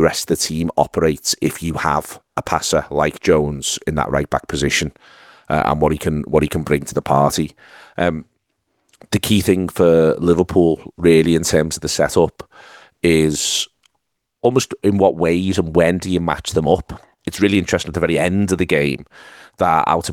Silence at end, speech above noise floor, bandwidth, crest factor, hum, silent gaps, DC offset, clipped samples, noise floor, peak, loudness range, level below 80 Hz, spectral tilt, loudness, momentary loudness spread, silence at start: 0 s; 55 dB; 19 kHz; 18 dB; none; none; under 0.1%; under 0.1%; -72 dBFS; 0 dBFS; 4 LU; -40 dBFS; -5 dB/octave; -17 LUFS; 7 LU; 0 s